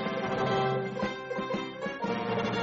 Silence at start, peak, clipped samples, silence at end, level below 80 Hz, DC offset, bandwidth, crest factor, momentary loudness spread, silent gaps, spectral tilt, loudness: 0 s; -16 dBFS; under 0.1%; 0 s; -62 dBFS; under 0.1%; 7.6 kHz; 14 dB; 6 LU; none; -4 dB/octave; -31 LUFS